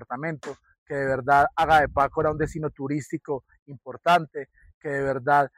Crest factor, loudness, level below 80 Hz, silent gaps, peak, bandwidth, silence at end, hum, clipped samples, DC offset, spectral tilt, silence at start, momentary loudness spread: 16 dB; -24 LUFS; -48 dBFS; 0.78-0.86 s, 3.62-3.66 s, 4.74-4.81 s; -8 dBFS; 15.5 kHz; 0.1 s; none; under 0.1%; under 0.1%; -6 dB/octave; 0 s; 18 LU